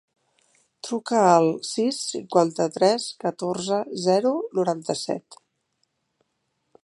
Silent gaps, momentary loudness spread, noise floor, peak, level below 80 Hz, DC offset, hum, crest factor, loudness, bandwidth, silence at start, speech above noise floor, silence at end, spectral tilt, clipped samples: none; 11 LU; -75 dBFS; -4 dBFS; -74 dBFS; under 0.1%; none; 20 dB; -23 LUFS; 11.5 kHz; 0.85 s; 52 dB; 1.65 s; -4.5 dB/octave; under 0.1%